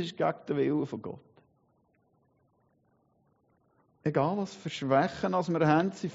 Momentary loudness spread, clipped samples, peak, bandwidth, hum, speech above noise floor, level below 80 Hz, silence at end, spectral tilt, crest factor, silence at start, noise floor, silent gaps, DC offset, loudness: 11 LU; under 0.1%; -12 dBFS; 7.6 kHz; none; 41 dB; -70 dBFS; 0 s; -5.5 dB/octave; 20 dB; 0 s; -70 dBFS; none; under 0.1%; -29 LUFS